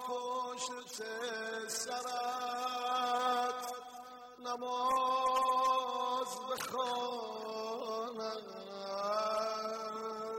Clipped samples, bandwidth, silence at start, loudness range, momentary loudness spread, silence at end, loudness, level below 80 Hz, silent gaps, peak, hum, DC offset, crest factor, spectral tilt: under 0.1%; 16.5 kHz; 0 s; 4 LU; 11 LU; 0 s; -36 LUFS; -78 dBFS; none; -20 dBFS; none; under 0.1%; 16 dB; -1.5 dB/octave